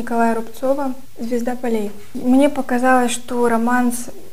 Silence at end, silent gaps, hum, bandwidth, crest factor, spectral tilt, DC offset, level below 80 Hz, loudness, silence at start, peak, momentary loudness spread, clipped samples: 0 s; none; none; 16 kHz; 16 dB; -4 dB/octave; 6%; -52 dBFS; -19 LUFS; 0 s; -2 dBFS; 10 LU; under 0.1%